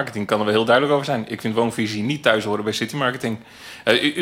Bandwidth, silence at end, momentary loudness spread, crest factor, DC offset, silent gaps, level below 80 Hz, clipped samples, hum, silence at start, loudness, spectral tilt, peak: 16.5 kHz; 0 s; 9 LU; 20 dB; under 0.1%; none; -60 dBFS; under 0.1%; none; 0 s; -20 LUFS; -5 dB/octave; -2 dBFS